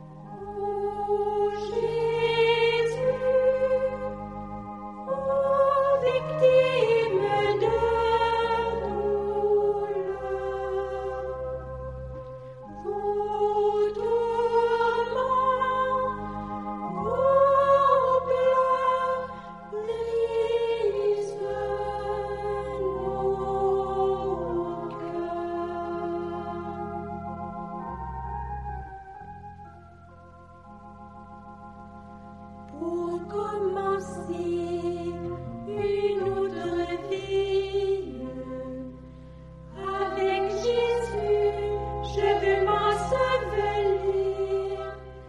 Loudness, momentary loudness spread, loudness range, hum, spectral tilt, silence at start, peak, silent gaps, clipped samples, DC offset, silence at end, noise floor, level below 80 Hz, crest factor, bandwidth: -26 LUFS; 16 LU; 12 LU; none; -6 dB/octave; 0 s; -10 dBFS; none; under 0.1%; under 0.1%; 0 s; -49 dBFS; -48 dBFS; 18 dB; 10.5 kHz